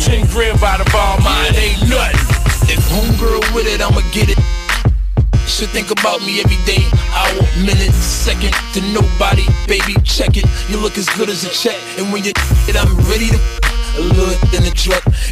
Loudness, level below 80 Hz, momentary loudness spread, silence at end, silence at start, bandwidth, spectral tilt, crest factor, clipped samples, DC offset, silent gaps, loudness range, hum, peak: -14 LUFS; -16 dBFS; 4 LU; 0 s; 0 s; 15.5 kHz; -4.5 dB/octave; 10 dB; under 0.1%; under 0.1%; none; 2 LU; none; -2 dBFS